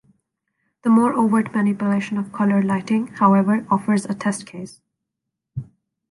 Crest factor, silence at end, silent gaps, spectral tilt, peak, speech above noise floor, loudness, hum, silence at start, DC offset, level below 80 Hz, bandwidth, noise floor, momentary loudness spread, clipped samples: 16 dB; 0.5 s; none; -7 dB/octave; -4 dBFS; 63 dB; -19 LUFS; none; 0.85 s; under 0.1%; -62 dBFS; 11.5 kHz; -82 dBFS; 18 LU; under 0.1%